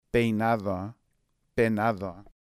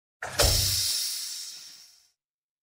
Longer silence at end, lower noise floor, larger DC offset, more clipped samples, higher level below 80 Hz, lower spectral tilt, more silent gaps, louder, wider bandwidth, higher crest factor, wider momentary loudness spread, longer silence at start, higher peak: second, 0.15 s vs 0.75 s; about the same, -73 dBFS vs -72 dBFS; neither; neither; second, -52 dBFS vs -40 dBFS; first, -7.5 dB/octave vs -1.5 dB/octave; neither; second, -28 LUFS vs -25 LUFS; about the same, 15.5 kHz vs 16.5 kHz; second, 18 dB vs 24 dB; second, 12 LU vs 19 LU; about the same, 0.15 s vs 0.2 s; second, -12 dBFS vs -6 dBFS